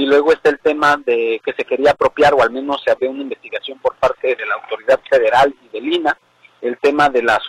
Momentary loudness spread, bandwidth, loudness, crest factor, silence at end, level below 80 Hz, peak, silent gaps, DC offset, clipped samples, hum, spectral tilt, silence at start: 12 LU; 12 kHz; -16 LUFS; 14 dB; 0 s; -50 dBFS; -2 dBFS; none; under 0.1%; under 0.1%; none; -4.5 dB/octave; 0 s